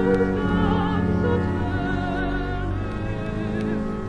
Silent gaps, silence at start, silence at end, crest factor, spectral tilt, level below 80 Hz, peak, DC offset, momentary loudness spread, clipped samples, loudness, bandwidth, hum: none; 0 s; 0 s; 14 dB; -8.5 dB/octave; -34 dBFS; -8 dBFS; under 0.1%; 7 LU; under 0.1%; -24 LUFS; 10 kHz; none